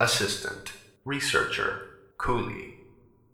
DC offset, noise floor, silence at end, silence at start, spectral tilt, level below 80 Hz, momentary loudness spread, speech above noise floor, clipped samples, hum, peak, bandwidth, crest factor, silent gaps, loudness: under 0.1%; -57 dBFS; 0.5 s; 0 s; -3 dB/octave; -48 dBFS; 17 LU; 29 dB; under 0.1%; none; -8 dBFS; 19.5 kHz; 22 dB; none; -28 LUFS